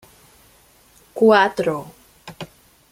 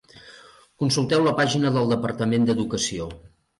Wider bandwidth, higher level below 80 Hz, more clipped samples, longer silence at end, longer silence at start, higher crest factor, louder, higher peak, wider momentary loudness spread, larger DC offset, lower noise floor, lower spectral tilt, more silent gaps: first, 16 kHz vs 11.5 kHz; second, -60 dBFS vs -52 dBFS; neither; first, 0.45 s vs 0.3 s; first, 1.15 s vs 0.15 s; first, 20 dB vs 14 dB; first, -17 LUFS vs -22 LUFS; first, -2 dBFS vs -10 dBFS; first, 24 LU vs 7 LU; neither; about the same, -53 dBFS vs -50 dBFS; about the same, -5.5 dB/octave vs -5 dB/octave; neither